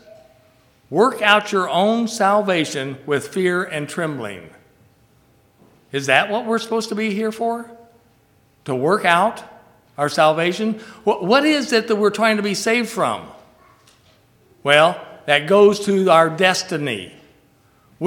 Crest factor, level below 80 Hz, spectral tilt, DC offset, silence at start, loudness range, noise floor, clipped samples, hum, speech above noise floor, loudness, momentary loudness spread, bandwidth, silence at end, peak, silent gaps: 20 dB; -66 dBFS; -4 dB/octave; under 0.1%; 0.9 s; 6 LU; -57 dBFS; under 0.1%; none; 39 dB; -18 LUFS; 13 LU; 17.5 kHz; 0 s; 0 dBFS; none